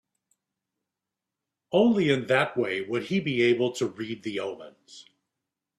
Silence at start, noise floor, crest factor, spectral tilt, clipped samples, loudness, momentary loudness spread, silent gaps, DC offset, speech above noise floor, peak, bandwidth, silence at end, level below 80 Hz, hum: 1.7 s; -87 dBFS; 20 dB; -6 dB/octave; under 0.1%; -26 LUFS; 12 LU; none; under 0.1%; 62 dB; -8 dBFS; 12 kHz; 0.75 s; -68 dBFS; none